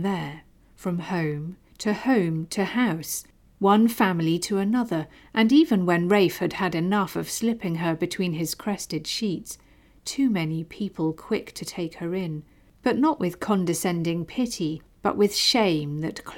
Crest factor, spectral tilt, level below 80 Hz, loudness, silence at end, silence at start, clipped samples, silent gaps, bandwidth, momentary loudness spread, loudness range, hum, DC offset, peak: 16 dB; -5 dB/octave; -58 dBFS; -25 LUFS; 0 s; 0 s; under 0.1%; none; 18.5 kHz; 12 LU; 6 LU; none; under 0.1%; -8 dBFS